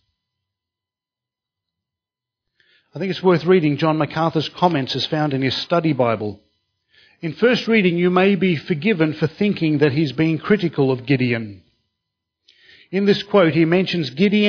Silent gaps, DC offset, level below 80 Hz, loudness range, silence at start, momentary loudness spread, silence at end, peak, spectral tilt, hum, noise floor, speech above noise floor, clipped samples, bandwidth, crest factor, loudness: none; under 0.1%; -60 dBFS; 4 LU; 2.95 s; 7 LU; 0 s; -2 dBFS; -7.5 dB/octave; none; -89 dBFS; 71 dB; under 0.1%; 5.4 kHz; 18 dB; -18 LUFS